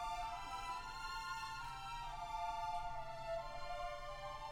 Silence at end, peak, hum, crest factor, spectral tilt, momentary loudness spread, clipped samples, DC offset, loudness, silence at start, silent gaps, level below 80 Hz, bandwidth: 0 s; -32 dBFS; none; 12 dB; -3 dB/octave; 4 LU; under 0.1%; under 0.1%; -46 LUFS; 0 s; none; -56 dBFS; 18.5 kHz